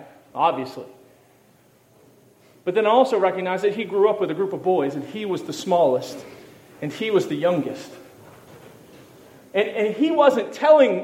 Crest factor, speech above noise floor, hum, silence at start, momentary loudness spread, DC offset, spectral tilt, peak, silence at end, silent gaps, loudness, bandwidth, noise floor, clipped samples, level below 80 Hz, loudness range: 18 dB; 36 dB; none; 0 s; 17 LU; under 0.1%; -5.5 dB/octave; -4 dBFS; 0 s; none; -21 LUFS; 16 kHz; -56 dBFS; under 0.1%; -74 dBFS; 5 LU